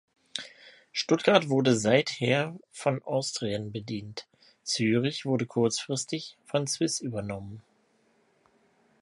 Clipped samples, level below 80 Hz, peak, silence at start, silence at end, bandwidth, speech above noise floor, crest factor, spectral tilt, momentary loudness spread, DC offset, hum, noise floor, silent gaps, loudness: under 0.1%; -66 dBFS; -6 dBFS; 0.35 s; 1.4 s; 11.5 kHz; 40 dB; 24 dB; -4.5 dB/octave; 16 LU; under 0.1%; none; -68 dBFS; none; -28 LUFS